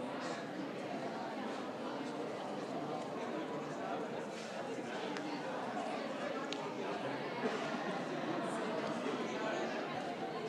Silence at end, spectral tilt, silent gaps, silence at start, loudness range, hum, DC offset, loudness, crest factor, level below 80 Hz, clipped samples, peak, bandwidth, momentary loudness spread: 0 s; -5 dB/octave; none; 0 s; 3 LU; none; under 0.1%; -41 LUFS; 20 dB; -88 dBFS; under 0.1%; -22 dBFS; 14 kHz; 4 LU